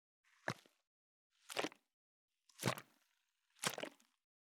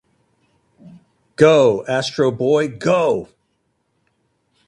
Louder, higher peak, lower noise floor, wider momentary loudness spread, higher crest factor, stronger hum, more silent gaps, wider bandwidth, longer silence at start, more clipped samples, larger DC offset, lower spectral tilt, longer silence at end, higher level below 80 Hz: second, -45 LUFS vs -16 LUFS; second, -22 dBFS vs 0 dBFS; first, -84 dBFS vs -68 dBFS; about the same, 8 LU vs 9 LU; first, 28 dB vs 18 dB; neither; first, 0.87-1.30 s, 1.93-2.28 s vs none; first, over 20 kHz vs 11 kHz; second, 0.45 s vs 1.4 s; neither; neither; second, -3 dB/octave vs -5.5 dB/octave; second, 0.6 s vs 1.45 s; second, under -90 dBFS vs -58 dBFS